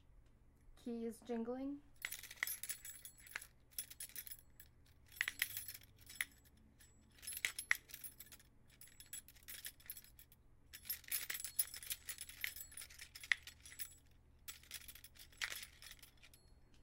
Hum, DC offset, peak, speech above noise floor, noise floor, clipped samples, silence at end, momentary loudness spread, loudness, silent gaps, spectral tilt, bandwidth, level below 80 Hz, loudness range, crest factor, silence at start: none; under 0.1%; -14 dBFS; 22 dB; -67 dBFS; under 0.1%; 0 s; 21 LU; -46 LUFS; none; -1 dB/octave; 17 kHz; -70 dBFS; 5 LU; 36 dB; 0.05 s